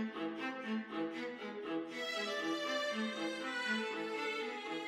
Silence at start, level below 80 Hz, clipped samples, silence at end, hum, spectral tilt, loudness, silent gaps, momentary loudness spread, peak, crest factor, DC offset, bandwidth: 0 s; -86 dBFS; under 0.1%; 0 s; none; -3.5 dB/octave; -39 LUFS; none; 5 LU; -24 dBFS; 16 dB; under 0.1%; 15.5 kHz